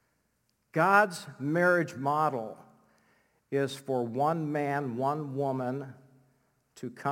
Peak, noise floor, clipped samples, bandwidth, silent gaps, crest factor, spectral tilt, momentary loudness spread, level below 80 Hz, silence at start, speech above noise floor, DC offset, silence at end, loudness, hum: -10 dBFS; -75 dBFS; under 0.1%; 17 kHz; none; 22 dB; -6.5 dB/octave; 14 LU; -84 dBFS; 0.75 s; 46 dB; under 0.1%; 0 s; -29 LUFS; none